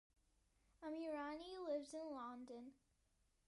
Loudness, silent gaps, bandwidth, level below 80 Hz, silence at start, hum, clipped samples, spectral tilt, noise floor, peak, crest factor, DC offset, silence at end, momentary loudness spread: -50 LUFS; none; 11.5 kHz; -80 dBFS; 0.8 s; none; under 0.1%; -3.5 dB/octave; -82 dBFS; -36 dBFS; 16 dB; under 0.1%; 0.75 s; 10 LU